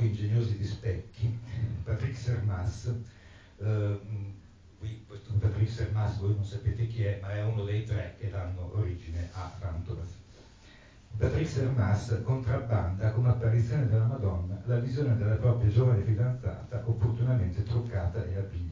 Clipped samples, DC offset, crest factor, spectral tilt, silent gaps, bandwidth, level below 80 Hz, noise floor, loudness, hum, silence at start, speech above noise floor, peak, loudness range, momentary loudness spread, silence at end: under 0.1%; under 0.1%; 16 dB; -8.5 dB/octave; none; 7.6 kHz; -42 dBFS; -54 dBFS; -31 LUFS; none; 0 s; 25 dB; -14 dBFS; 7 LU; 12 LU; 0 s